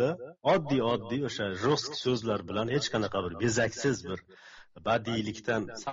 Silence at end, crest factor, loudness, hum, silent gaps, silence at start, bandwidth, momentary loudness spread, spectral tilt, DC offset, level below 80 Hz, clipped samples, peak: 0 s; 18 dB; -30 LUFS; none; none; 0 s; 7.6 kHz; 5 LU; -4 dB/octave; under 0.1%; -60 dBFS; under 0.1%; -12 dBFS